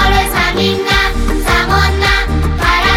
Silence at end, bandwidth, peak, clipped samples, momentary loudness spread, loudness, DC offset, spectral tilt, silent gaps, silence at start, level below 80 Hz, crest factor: 0 s; 16.5 kHz; 0 dBFS; under 0.1%; 3 LU; -12 LUFS; 0.9%; -4.5 dB/octave; none; 0 s; -18 dBFS; 12 dB